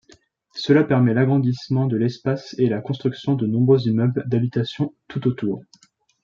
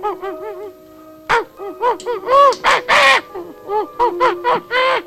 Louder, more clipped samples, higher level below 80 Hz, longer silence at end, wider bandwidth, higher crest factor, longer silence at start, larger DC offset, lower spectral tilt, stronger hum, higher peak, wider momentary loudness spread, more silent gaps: second, -21 LUFS vs -15 LUFS; neither; second, -62 dBFS vs -50 dBFS; first, 0.65 s vs 0 s; second, 7.2 kHz vs 15.5 kHz; about the same, 16 dB vs 16 dB; first, 0.55 s vs 0 s; neither; first, -8.5 dB/octave vs -2 dB/octave; neither; about the same, -4 dBFS vs -2 dBFS; second, 9 LU vs 20 LU; neither